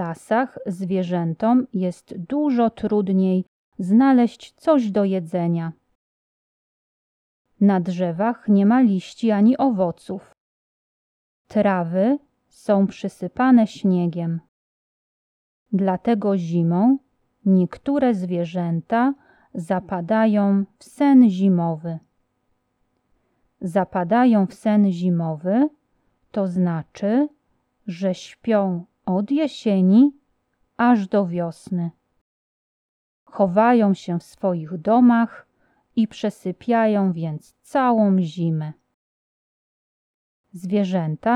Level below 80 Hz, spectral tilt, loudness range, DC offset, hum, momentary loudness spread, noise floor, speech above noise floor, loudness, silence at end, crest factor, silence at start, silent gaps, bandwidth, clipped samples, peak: -64 dBFS; -8.5 dB/octave; 4 LU; under 0.1%; none; 13 LU; -70 dBFS; 51 dB; -20 LUFS; 0 s; 16 dB; 0 s; 3.48-3.72 s, 5.95-7.45 s, 10.40-11.45 s, 14.48-15.66 s, 32.21-33.26 s, 38.94-40.44 s; 11 kHz; under 0.1%; -4 dBFS